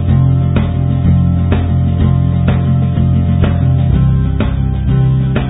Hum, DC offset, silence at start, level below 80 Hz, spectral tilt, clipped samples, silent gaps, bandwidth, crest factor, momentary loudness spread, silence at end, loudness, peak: none; under 0.1%; 0 s; -18 dBFS; -14 dB/octave; under 0.1%; none; 4 kHz; 10 dB; 2 LU; 0 s; -12 LUFS; -2 dBFS